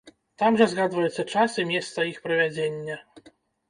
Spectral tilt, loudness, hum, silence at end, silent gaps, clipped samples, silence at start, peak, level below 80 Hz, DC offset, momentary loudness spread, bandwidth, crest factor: -5 dB/octave; -24 LUFS; none; 0.4 s; none; under 0.1%; 0.05 s; -6 dBFS; -68 dBFS; under 0.1%; 10 LU; 10.5 kHz; 20 dB